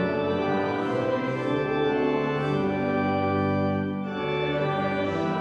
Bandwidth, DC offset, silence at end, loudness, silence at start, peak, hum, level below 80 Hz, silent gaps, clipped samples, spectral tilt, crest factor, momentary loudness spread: 8.4 kHz; under 0.1%; 0 s; -26 LUFS; 0 s; -12 dBFS; none; -56 dBFS; none; under 0.1%; -8 dB/octave; 12 dB; 2 LU